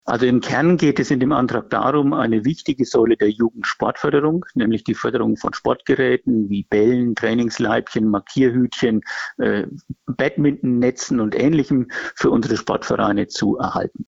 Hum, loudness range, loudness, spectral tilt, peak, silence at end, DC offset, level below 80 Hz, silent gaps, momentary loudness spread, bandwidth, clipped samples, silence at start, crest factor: none; 2 LU; -19 LUFS; -6 dB/octave; -6 dBFS; 0.05 s; under 0.1%; -50 dBFS; none; 5 LU; 7.8 kHz; under 0.1%; 0.05 s; 12 dB